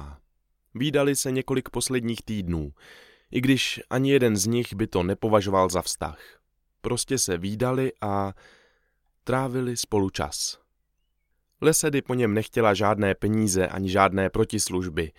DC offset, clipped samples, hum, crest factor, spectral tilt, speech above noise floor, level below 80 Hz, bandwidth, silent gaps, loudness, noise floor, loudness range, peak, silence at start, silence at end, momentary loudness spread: under 0.1%; under 0.1%; none; 22 dB; -4.5 dB/octave; 49 dB; -48 dBFS; 17 kHz; none; -25 LUFS; -73 dBFS; 5 LU; -4 dBFS; 0 s; 0.1 s; 9 LU